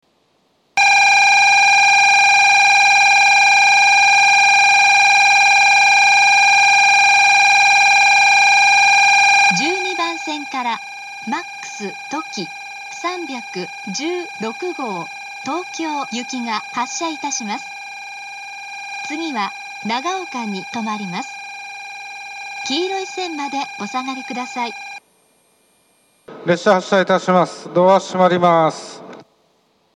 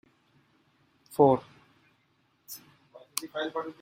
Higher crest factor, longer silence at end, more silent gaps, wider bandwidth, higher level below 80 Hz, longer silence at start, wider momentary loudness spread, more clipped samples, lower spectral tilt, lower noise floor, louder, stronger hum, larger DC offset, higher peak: second, 16 dB vs 26 dB; first, 0.75 s vs 0.1 s; neither; second, 13 kHz vs 16 kHz; about the same, -76 dBFS vs -72 dBFS; second, 0.75 s vs 1.1 s; second, 19 LU vs 22 LU; neither; second, -2 dB/octave vs -5 dB/octave; second, -61 dBFS vs -70 dBFS; first, -12 LUFS vs -28 LUFS; neither; neither; first, 0 dBFS vs -6 dBFS